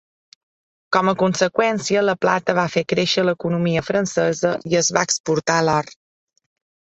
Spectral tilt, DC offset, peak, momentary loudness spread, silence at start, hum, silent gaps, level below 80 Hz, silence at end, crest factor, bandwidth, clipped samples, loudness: -4 dB/octave; under 0.1%; -2 dBFS; 3 LU; 0.9 s; none; 5.20-5.24 s; -58 dBFS; 0.95 s; 20 dB; 8.4 kHz; under 0.1%; -19 LUFS